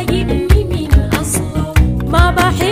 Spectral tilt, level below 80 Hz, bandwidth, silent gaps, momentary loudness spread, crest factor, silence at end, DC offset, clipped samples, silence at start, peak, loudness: -5.5 dB/octave; -16 dBFS; 16 kHz; none; 4 LU; 12 dB; 0 s; under 0.1%; under 0.1%; 0 s; 0 dBFS; -14 LUFS